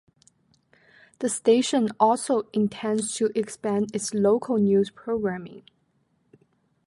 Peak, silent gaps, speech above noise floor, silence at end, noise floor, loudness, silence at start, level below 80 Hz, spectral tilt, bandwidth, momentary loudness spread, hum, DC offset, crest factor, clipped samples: -6 dBFS; none; 45 dB; 1.25 s; -69 dBFS; -24 LUFS; 1.2 s; -66 dBFS; -5 dB/octave; 11.5 kHz; 8 LU; none; under 0.1%; 18 dB; under 0.1%